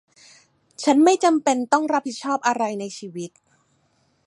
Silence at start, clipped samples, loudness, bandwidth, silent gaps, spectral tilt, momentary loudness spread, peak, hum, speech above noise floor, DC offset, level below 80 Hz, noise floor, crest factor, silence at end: 0.8 s; under 0.1%; -20 LUFS; 11.5 kHz; none; -3.5 dB/octave; 17 LU; -4 dBFS; none; 45 dB; under 0.1%; -76 dBFS; -65 dBFS; 20 dB; 1 s